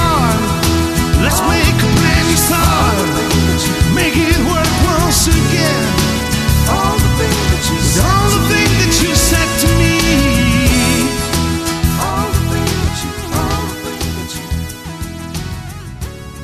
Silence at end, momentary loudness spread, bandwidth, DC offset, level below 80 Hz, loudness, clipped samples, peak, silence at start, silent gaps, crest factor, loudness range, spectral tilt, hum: 0 s; 11 LU; 14 kHz; under 0.1%; -20 dBFS; -13 LUFS; under 0.1%; 0 dBFS; 0 s; none; 14 dB; 7 LU; -4 dB/octave; none